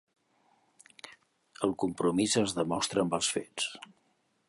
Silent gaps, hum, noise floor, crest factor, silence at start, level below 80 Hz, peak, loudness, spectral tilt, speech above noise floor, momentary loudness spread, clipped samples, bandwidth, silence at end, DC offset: none; none; -73 dBFS; 20 dB; 1.05 s; -66 dBFS; -12 dBFS; -30 LUFS; -3.5 dB/octave; 43 dB; 22 LU; under 0.1%; 11.5 kHz; 0.7 s; under 0.1%